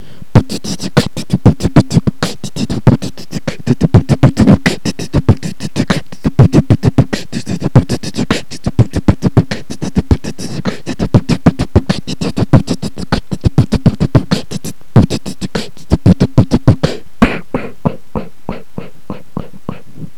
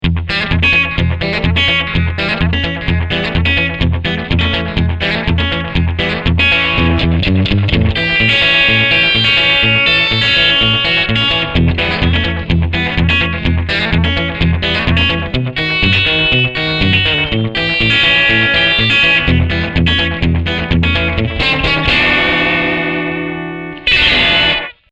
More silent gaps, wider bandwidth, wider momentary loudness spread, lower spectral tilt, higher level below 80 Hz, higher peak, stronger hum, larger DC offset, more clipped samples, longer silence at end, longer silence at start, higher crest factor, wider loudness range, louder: neither; first, 13.5 kHz vs 8.2 kHz; first, 14 LU vs 7 LU; about the same, -7 dB/octave vs -6 dB/octave; about the same, -26 dBFS vs -24 dBFS; about the same, 0 dBFS vs 0 dBFS; neither; first, 8% vs under 0.1%; first, 1% vs under 0.1%; about the same, 0.15 s vs 0.2 s; first, 0.35 s vs 0 s; about the same, 14 dB vs 12 dB; about the same, 3 LU vs 5 LU; second, -14 LUFS vs -11 LUFS